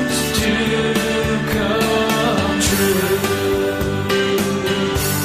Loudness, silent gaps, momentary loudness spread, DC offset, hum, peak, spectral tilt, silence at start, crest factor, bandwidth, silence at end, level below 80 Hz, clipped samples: -17 LUFS; none; 3 LU; under 0.1%; none; -4 dBFS; -4 dB/octave; 0 s; 12 dB; 15.5 kHz; 0 s; -34 dBFS; under 0.1%